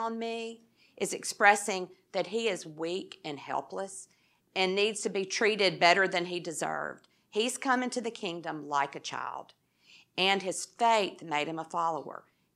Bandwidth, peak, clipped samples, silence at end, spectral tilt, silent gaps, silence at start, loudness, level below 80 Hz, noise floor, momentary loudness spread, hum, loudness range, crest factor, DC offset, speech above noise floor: 14.5 kHz; -6 dBFS; under 0.1%; 0.35 s; -2.5 dB/octave; none; 0 s; -30 LUFS; -88 dBFS; -61 dBFS; 15 LU; none; 5 LU; 26 dB; under 0.1%; 30 dB